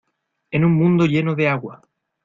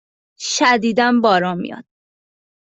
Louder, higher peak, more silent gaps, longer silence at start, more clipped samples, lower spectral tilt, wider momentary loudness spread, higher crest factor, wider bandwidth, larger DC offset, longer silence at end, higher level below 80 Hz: about the same, -18 LUFS vs -16 LUFS; about the same, -4 dBFS vs -2 dBFS; neither; about the same, 0.5 s vs 0.4 s; neither; first, -8.5 dB/octave vs -3.5 dB/octave; second, 10 LU vs 15 LU; about the same, 14 dB vs 16 dB; second, 7.2 kHz vs 8.4 kHz; neither; second, 0.5 s vs 0.85 s; first, -56 dBFS vs -64 dBFS